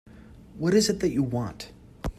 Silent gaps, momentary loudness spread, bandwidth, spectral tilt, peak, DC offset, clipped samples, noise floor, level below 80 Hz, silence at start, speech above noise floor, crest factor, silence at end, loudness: none; 18 LU; 14.5 kHz; -5 dB/octave; -10 dBFS; under 0.1%; under 0.1%; -48 dBFS; -44 dBFS; 0.05 s; 23 dB; 18 dB; 0.05 s; -25 LUFS